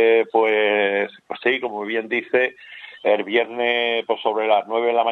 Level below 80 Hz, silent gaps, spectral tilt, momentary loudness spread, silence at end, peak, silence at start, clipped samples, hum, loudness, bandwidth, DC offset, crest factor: -80 dBFS; none; -5.5 dB/octave; 7 LU; 0 s; -4 dBFS; 0 s; under 0.1%; none; -20 LUFS; 4.3 kHz; under 0.1%; 16 dB